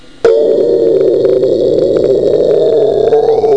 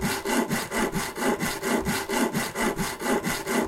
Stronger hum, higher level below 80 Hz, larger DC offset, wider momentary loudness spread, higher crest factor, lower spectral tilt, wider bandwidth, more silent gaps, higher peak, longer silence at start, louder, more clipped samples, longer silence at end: neither; about the same, -44 dBFS vs -46 dBFS; first, 1% vs under 0.1%; about the same, 1 LU vs 2 LU; second, 8 dB vs 14 dB; first, -7.5 dB/octave vs -3.5 dB/octave; second, 8.2 kHz vs 17 kHz; neither; first, 0 dBFS vs -12 dBFS; first, 0.25 s vs 0 s; first, -10 LUFS vs -26 LUFS; neither; about the same, 0 s vs 0 s